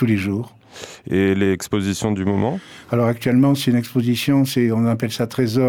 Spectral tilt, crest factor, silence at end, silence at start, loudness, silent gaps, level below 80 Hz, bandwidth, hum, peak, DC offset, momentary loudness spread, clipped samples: -6.5 dB/octave; 12 dB; 0 s; 0 s; -19 LUFS; none; -54 dBFS; 19.5 kHz; none; -6 dBFS; under 0.1%; 10 LU; under 0.1%